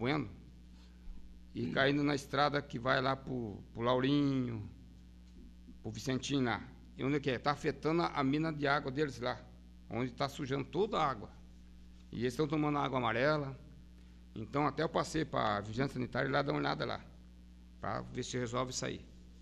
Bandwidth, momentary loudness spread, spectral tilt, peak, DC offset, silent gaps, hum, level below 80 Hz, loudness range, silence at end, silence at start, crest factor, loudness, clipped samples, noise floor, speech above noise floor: 13 kHz; 14 LU; -5.5 dB/octave; -16 dBFS; under 0.1%; none; none; -56 dBFS; 4 LU; 0 s; 0 s; 20 dB; -35 LUFS; under 0.1%; -56 dBFS; 21 dB